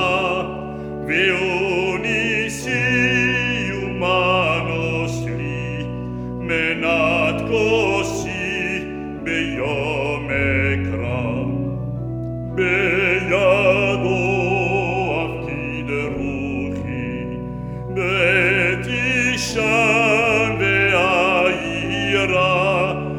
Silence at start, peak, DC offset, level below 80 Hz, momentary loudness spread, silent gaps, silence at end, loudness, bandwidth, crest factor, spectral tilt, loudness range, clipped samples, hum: 0 s; -4 dBFS; under 0.1%; -40 dBFS; 11 LU; none; 0 s; -19 LUFS; 15.5 kHz; 16 dB; -5 dB/octave; 5 LU; under 0.1%; none